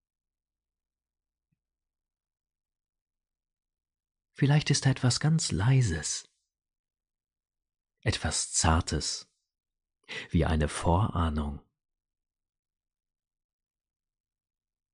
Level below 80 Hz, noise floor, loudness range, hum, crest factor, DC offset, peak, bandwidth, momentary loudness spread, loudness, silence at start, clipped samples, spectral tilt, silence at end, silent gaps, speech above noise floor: -44 dBFS; -84 dBFS; 6 LU; none; 22 dB; under 0.1%; -10 dBFS; 10.5 kHz; 10 LU; -28 LUFS; 4.4 s; under 0.1%; -4.5 dB/octave; 3.35 s; 6.79-6.84 s; 57 dB